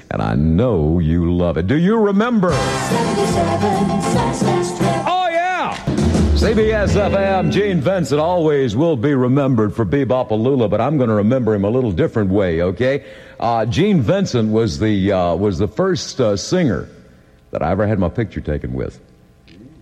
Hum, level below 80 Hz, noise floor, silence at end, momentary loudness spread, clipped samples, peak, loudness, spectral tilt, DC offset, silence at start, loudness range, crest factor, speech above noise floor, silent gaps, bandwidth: none; -32 dBFS; -47 dBFS; 0.15 s; 5 LU; under 0.1%; -4 dBFS; -17 LUFS; -6.5 dB/octave; under 0.1%; 0.1 s; 3 LU; 12 dB; 31 dB; none; 13 kHz